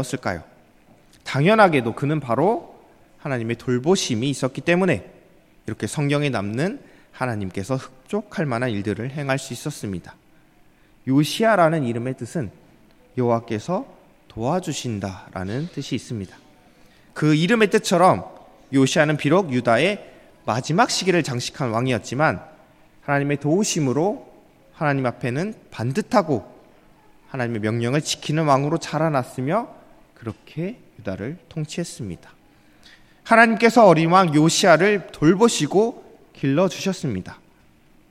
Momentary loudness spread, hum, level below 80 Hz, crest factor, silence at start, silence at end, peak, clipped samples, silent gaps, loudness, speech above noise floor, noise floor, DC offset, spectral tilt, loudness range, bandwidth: 17 LU; none; -58 dBFS; 22 dB; 0 s; 0.75 s; 0 dBFS; under 0.1%; none; -21 LUFS; 34 dB; -54 dBFS; under 0.1%; -5.5 dB/octave; 10 LU; 15.5 kHz